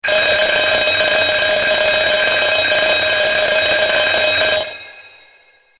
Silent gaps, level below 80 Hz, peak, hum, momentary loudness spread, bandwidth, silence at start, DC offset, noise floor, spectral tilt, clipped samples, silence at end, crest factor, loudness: none; -46 dBFS; -2 dBFS; none; 1 LU; 4 kHz; 0.05 s; under 0.1%; -51 dBFS; -6 dB/octave; under 0.1%; 0.7 s; 14 dB; -13 LUFS